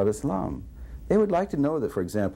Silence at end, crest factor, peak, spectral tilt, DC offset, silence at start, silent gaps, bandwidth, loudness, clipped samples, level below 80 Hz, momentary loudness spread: 0 s; 16 dB; -10 dBFS; -7.5 dB/octave; under 0.1%; 0 s; none; 16.5 kHz; -26 LUFS; under 0.1%; -44 dBFS; 16 LU